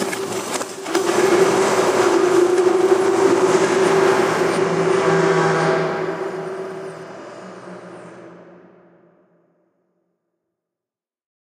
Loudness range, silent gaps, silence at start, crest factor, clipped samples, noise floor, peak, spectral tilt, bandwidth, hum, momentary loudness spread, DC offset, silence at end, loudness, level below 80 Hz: 17 LU; none; 0 s; 16 dB; under 0.1%; -89 dBFS; -4 dBFS; -4.5 dB/octave; 15.5 kHz; none; 20 LU; under 0.1%; 3.1 s; -17 LUFS; -68 dBFS